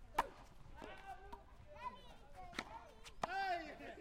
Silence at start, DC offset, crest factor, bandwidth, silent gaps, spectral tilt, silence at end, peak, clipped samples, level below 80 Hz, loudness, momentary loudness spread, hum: 0 s; under 0.1%; 26 dB; 16 kHz; none; -3.5 dB/octave; 0 s; -22 dBFS; under 0.1%; -62 dBFS; -47 LUFS; 18 LU; none